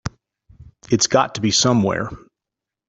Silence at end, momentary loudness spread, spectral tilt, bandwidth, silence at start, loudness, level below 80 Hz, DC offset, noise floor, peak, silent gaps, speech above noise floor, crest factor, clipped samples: 0.7 s; 13 LU; -3.5 dB/octave; 8.4 kHz; 0.05 s; -18 LUFS; -50 dBFS; under 0.1%; -86 dBFS; -2 dBFS; none; 68 dB; 18 dB; under 0.1%